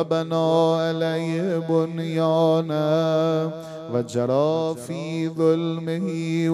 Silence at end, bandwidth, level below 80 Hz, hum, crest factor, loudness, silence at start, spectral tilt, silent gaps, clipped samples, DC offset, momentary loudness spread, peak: 0 s; 12.5 kHz; -70 dBFS; none; 14 dB; -23 LUFS; 0 s; -7 dB/octave; none; under 0.1%; under 0.1%; 8 LU; -8 dBFS